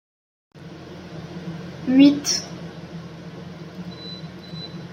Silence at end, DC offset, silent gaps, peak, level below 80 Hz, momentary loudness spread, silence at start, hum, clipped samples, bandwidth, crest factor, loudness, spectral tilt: 0 s; under 0.1%; none; -2 dBFS; -62 dBFS; 23 LU; 0.55 s; none; under 0.1%; 16 kHz; 22 dB; -20 LUFS; -4.5 dB/octave